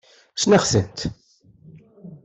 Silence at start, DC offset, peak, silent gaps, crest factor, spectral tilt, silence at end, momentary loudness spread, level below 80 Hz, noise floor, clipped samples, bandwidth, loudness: 0.35 s; under 0.1%; -4 dBFS; none; 20 dB; -4.5 dB/octave; 0.1 s; 15 LU; -48 dBFS; -52 dBFS; under 0.1%; 8.4 kHz; -20 LUFS